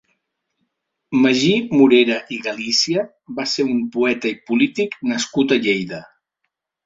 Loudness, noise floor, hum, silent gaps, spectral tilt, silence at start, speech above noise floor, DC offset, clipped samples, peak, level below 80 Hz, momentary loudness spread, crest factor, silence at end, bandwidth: -18 LUFS; -76 dBFS; none; none; -4 dB/octave; 1.1 s; 58 dB; under 0.1%; under 0.1%; -2 dBFS; -62 dBFS; 11 LU; 18 dB; 0.85 s; 7.8 kHz